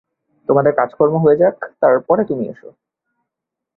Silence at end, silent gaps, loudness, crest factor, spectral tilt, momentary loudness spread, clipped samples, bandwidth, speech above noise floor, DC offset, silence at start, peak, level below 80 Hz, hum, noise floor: 1.25 s; none; -15 LUFS; 16 dB; -12 dB/octave; 10 LU; under 0.1%; 4.1 kHz; 67 dB; under 0.1%; 0.5 s; 0 dBFS; -60 dBFS; none; -82 dBFS